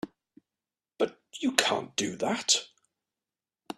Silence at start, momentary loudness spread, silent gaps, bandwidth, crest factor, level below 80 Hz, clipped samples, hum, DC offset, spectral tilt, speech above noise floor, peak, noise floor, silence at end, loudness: 0.05 s; 7 LU; none; 14 kHz; 32 dB; -74 dBFS; under 0.1%; none; under 0.1%; -1.5 dB/octave; over 61 dB; 0 dBFS; under -90 dBFS; 0.05 s; -28 LUFS